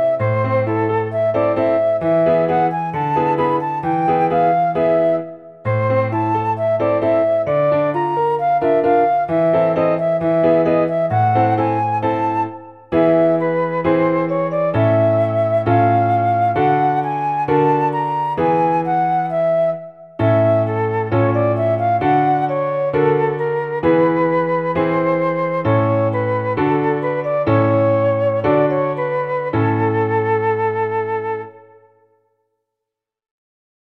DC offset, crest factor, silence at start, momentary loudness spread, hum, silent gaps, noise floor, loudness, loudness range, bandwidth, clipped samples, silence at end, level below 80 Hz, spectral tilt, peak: under 0.1%; 14 dB; 0 s; 5 LU; none; none; -83 dBFS; -17 LUFS; 2 LU; 5.6 kHz; under 0.1%; 2.35 s; -52 dBFS; -9.5 dB/octave; -2 dBFS